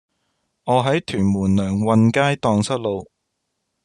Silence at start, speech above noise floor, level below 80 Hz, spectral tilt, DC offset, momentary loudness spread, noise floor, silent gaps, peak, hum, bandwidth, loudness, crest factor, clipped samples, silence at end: 0.65 s; 57 dB; -58 dBFS; -6.5 dB/octave; under 0.1%; 9 LU; -75 dBFS; none; -2 dBFS; none; 10.5 kHz; -19 LUFS; 18 dB; under 0.1%; 0.8 s